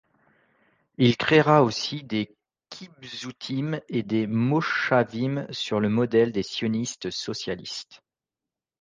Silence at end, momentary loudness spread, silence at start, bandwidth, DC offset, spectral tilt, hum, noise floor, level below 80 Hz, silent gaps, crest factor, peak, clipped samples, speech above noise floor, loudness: 0.85 s; 16 LU; 1 s; 9.8 kHz; under 0.1%; -5.5 dB/octave; none; -89 dBFS; -62 dBFS; none; 20 dB; -6 dBFS; under 0.1%; 65 dB; -24 LUFS